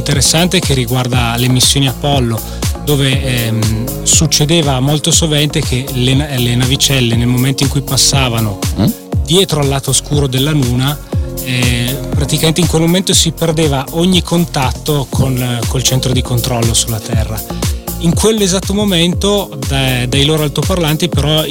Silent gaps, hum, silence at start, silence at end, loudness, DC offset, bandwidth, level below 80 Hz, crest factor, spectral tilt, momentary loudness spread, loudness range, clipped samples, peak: none; none; 0 s; 0 s; -12 LUFS; 0.3%; 17.5 kHz; -24 dBFS; 12 dB; -4 dB/octave; 7 LU; 2 LU; under 0.1%; 0 dBFS